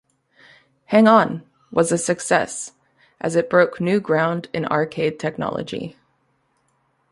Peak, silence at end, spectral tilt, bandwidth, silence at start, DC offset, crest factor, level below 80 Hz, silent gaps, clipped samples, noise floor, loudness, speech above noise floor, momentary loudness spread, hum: -2 dBFS; 1.2 s; -5 dB/octave; 11.5 kHz; 0.9 s; under 0.1%; 20 dB; -62 dBFS; none; under 0.1%; -66 dBFS; -20 LUFS; 47 dB; 15 LU; none